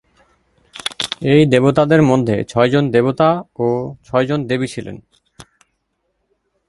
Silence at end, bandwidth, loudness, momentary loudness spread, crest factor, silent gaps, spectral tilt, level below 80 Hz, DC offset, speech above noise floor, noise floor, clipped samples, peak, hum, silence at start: 1.25 s; 11.5 kHz; -16 LUFS; 13 LU; 16 dB; none; -6.5 dB/octave; -50 dBFS; under 0.1%; 55 dB; -69 dBFS; under 0.1%; 0 dBFS; none; 0.75 s